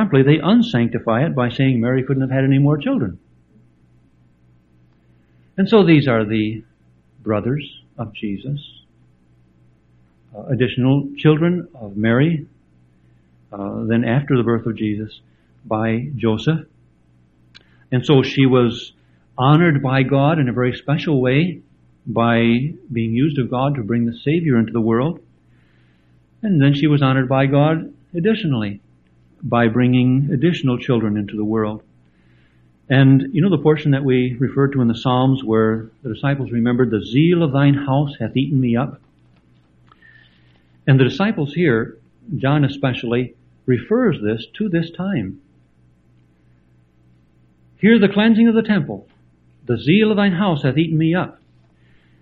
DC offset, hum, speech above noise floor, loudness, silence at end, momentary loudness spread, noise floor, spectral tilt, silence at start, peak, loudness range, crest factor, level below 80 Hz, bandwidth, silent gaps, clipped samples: under 0.1%; none; 38 dB; -17 LUFS; 0.9 s; 13 LU; -55 dBFS; -9 dB/octave; 0 s; 0 dBFS; 6 LU; 18 dB; -52 dBFS; 6.6 kHz; none; under 0.1%